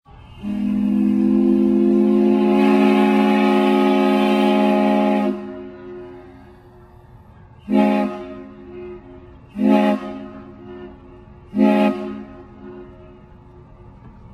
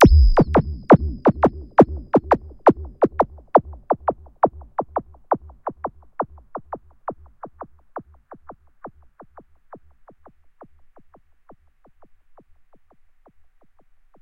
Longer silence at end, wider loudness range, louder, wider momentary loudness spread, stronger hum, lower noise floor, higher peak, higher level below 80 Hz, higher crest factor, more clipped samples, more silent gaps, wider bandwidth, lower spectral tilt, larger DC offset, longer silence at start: second, 0.25 s vs 5.35 s; second, 10 LU vs 23 LU; first, -17 LUFS vs -20 LUFS; about the same, 23 LU vs 24 LU; neither; second, -45 dBFS vs -53 dBFS; about the same, -2 dBFS vs 0 dBFS; second, -50 dBFS vs -28 dBFS; about the same, 16 dB vs 20 dB; neither; neither; first, 11 kHz vs 6.8 kHz; about the same, -7.5 dB/octave vs -8.5 dB/octave; neither; first, 0.35 s vs 0 s